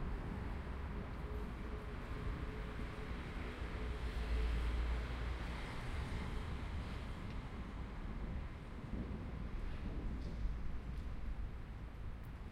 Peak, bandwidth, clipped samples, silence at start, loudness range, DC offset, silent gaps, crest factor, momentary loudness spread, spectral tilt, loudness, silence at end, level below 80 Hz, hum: -28 dBFS; 10.5 kHz; under 0.1%; 0 s; 4 LU; under 0.1%; none; 14 dB; 7 LU; -7 dB/octave; -46 LUFS; 0 s; -44 dBFS; none